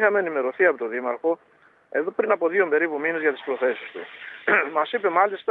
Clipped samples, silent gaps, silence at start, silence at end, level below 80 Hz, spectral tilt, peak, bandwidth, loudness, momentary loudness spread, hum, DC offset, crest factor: under 0.1%; none; 0 s; 0 s; -84 dBFS; -7.5 dB/octave; -4 dBFS; 4.1 kHz; -23 LUFS; 9 LU; none; under 0.1%; 20 dB